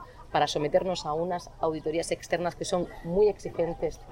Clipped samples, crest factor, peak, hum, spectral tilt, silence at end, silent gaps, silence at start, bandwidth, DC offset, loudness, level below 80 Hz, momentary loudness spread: under 0.1%; 18 dB; -12 dBFS; none; -5 dB/octave; 0 s; none; 0 s; 16 kHz; under 0.1%; -29 LUFS; -48 dBFS; 6 LU